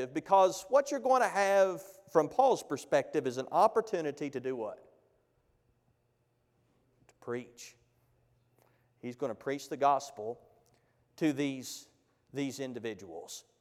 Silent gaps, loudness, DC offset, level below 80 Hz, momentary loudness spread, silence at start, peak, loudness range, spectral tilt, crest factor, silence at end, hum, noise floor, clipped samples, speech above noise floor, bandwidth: none; -31 LUFS; under 0.1%; -80 dBFS; 18 LU; 0 s; -12 dBFS; 20 LU; -4.5 dB/octave; 22 dB; 0.2 s; none; -75 dBFS; under 0.1%; 44 dB; 15.5 kHz